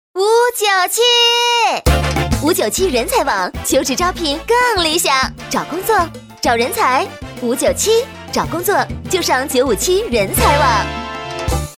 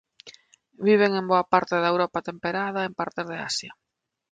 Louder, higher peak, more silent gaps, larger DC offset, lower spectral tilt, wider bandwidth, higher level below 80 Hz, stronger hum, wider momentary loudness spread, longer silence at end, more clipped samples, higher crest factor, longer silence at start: first, -15 LUFS vs -24 LUFS; first, 0 dBFS vs -4 dBFS; neither; neither; second, -3 dB/octave vs -4.5 dB/octave; first, 17 kHz vs 9.4 kHz; first, -30 dBFS vs -68 dBFS; neither; about the same, 9 LU vs 10 LU; second, 0.05 s vs 0.6 s; neither; second, 16 dB vs 22 dB; about the same, 0.15 s vs 0.25 s